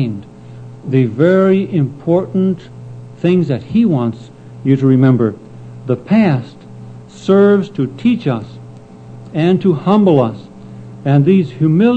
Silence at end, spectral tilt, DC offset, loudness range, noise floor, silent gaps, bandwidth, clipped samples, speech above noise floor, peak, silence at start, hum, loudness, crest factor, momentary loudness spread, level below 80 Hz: 0 s; -9.5 dB/octave; under 0.1%; 2 LU; -35 dBFS; none; 8.2 kHz; under 0.1%; 22 dB; 0 dBFS; 0 s; none; -14 LUFS; 14 dB; 23 LU; -52 dBFS